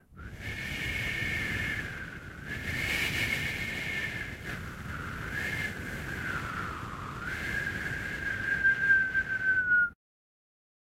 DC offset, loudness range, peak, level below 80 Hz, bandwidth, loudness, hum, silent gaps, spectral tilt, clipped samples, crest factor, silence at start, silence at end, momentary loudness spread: under 0.1%; 7 LU; -14 dBFS; -48 dBFS; 16 kHz; -31 LUFS; none; none; -3.5 dB/octave; under 0.1%; 18 dB; 0.1 s; 1 s; 14 LU